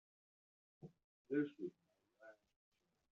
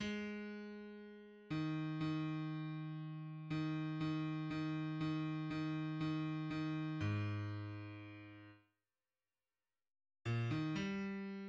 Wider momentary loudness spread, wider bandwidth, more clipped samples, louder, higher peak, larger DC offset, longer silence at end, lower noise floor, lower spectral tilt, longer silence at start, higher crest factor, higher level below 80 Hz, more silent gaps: first, 23 LU vs 13 LU; second, 4.1 kHz vs 7.6 kHz; neither; about the same, -45 LUFS vs -43 LUFS; about the same, -28 dBFS vs -30 dBFS; neither; first, 0.9 s vs 0 s; second, -66 dBFS vs under -90 dBFS; about the same, -7 dB/octave vs -7.5 dB/octave; first, 0.85 s vs 0 s; first, 22 dB vs 14 dB; second, under -90 dBFS vs -72 dBFS; first, 1.04-1.25 s vs none